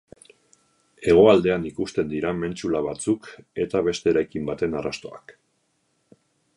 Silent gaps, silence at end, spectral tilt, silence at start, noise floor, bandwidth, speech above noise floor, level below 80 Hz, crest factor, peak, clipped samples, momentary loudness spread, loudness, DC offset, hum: none; 1.25 s; -6 dB/octave; 1 s; -70 dBFS; 11 kHz; 48 dB; -52 dBFS; 20 dB; -4 dBFS; under 0.1%; 14 LU; -23 LUFS; under 0.1%; none